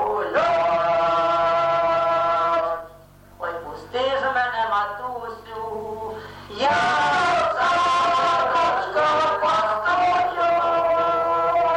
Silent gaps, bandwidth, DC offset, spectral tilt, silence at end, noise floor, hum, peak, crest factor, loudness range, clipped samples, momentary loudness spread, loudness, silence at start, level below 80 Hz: none; 10 kHz; under 0.1%; -3.5 dB/octave; 0 s; -47 dBFS; none; -10 dBFS; 10 dB; 6 LU; under 0.1%; 12 LU; -21 LUFS; 0 s; -54 dBFS